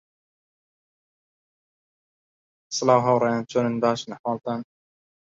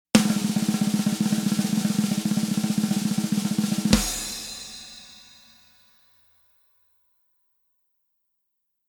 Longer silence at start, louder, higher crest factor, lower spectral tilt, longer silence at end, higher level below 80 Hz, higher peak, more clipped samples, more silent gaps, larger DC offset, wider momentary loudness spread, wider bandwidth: first, 2.7 s vs 0.15 s; about the same, -23 LUFS vs -24 LUFS; about the same, 24 dB vs 26 dB; about the same, -5 dB/octave vs -4.5 dB/octave; second, 0.7 s vs 3.65 s; second, -70 dBFS vs -46 dBFS; second, -4 dBFS vs 0 dBFS; neither; first, 4.19-4.24 s vs none; neither; second, 12 LU vs 16 LU; second, 7.8 kHz vs over 20 kHz